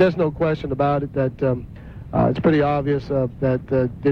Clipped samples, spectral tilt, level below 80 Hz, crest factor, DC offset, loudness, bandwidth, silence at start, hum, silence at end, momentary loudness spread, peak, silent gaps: under 0.1%; -9.5 dB/octave; -42 dBFS; 16 dB; under 0.1%; -21 LUFS; 6.4 kHz; 0 s; none; 0 s; 7 LU; -4 dBFS; none